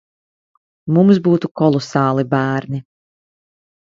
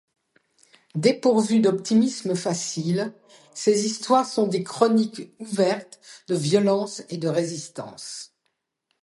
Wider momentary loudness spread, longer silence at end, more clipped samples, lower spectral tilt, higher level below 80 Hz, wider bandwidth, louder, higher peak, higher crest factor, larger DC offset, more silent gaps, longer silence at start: about the same, 14 LU vs 15 LU; first, 1.15 s vs 0.8 s; neither; first, -8 dB/octave vs -5 dB/octave; first, -58 dBFS vs -72 dBFS; second, 7.6 kHz vs 11.5 kHz; first, -16 LUFS vs -23 LUFS; first, 0 dBFS vs -4 dBFS; about the same, 18 dB vs 20 dB; neither; first, 1.51-1.55 s vs none; about the same, 0.85 s vs 0.95 s